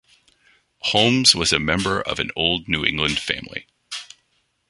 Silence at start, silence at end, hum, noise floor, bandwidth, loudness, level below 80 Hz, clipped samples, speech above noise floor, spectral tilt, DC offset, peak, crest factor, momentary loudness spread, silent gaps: 0.85 s; 0.65 s; none; -68 dBFS; 11.5 kHz; -19 LUFS; -44 dBFS; under 0.1%; 47 dB; -3 dB/octave; under 0.1%; 0 dBFS; 22 dB; 19 LU; none